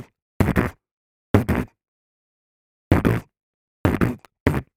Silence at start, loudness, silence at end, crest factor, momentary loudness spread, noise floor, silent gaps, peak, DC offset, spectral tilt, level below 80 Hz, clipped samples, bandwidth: 0 s; -23 LUFS; 0.15 s; 24 dB; 7 LU; under -90 dBFS; 0.22-0.40 s, 0.91-1.34 s, 1.88-2.91 s, 3.43-3.84 s, 4.40-4.46 s; 0 dBFS; under 0.1%; -8 dB/octave; -36 dBFS; under 0.1%; 16.5 kHz